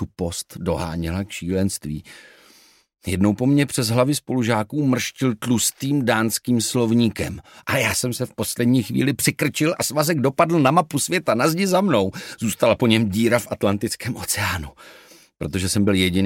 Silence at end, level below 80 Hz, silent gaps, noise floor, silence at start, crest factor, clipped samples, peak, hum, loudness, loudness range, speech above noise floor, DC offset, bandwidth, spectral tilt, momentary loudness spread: 0 s; -48 dBFS; none; -53 dBFS; 0 s; 20 dB; under 0.1%; -2 dBFS; none; -21 LUFS; 3 LU; 32 dB; under 0.1%; 17 kHz; -4.5 dB/octave; 9 LU